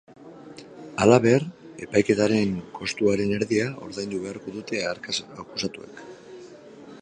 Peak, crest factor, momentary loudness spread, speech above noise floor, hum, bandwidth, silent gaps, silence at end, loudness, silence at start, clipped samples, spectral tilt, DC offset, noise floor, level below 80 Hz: -2 dBFS; 24 dB; 25 LU; 21 dB; none; 10.5 kHz; none; 0 s; -24 LUFS; 0.2 s; under 0.1%; -5.5 dB/octave; under 0.1%; -45 dBFS; -58 dBFS